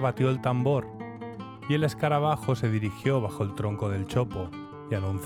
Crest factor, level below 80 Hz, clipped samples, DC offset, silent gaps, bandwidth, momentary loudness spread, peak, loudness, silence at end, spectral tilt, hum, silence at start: 16 dB; -56 dBFS; under 0.1%; under 0.1%; none; 14.5 kHz; 14 LU; -12 dBFS; -28 LUFS; 0 s; -7.5 dB/octave; none; 0 s